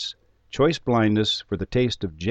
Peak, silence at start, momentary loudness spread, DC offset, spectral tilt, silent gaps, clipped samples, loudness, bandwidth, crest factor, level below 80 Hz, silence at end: -8 dBFS; 0 s; 9 LU; under 0.1%; -6 dB/octave; none; under 0.1%; -23 LUFS; 8.6 kHz; 16 dB; -46 dBFS; 0 s